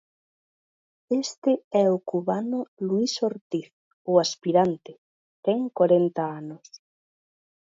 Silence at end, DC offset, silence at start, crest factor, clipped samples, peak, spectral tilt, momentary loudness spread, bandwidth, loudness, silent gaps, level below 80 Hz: 1 s; under 0.1%; 1.1 s; 20 dB; under 0.1%; -6 dBFS; -5.5 dB/octave; 11 LU; 7.8 kHz; -25 LUFS; 1.38-1.42 s, 1.64-1.71 s, 2.68-2.77 s, 3.41-3.50 s, 3.73-4.05 s, 4.98-5.43 s; -74 dBFS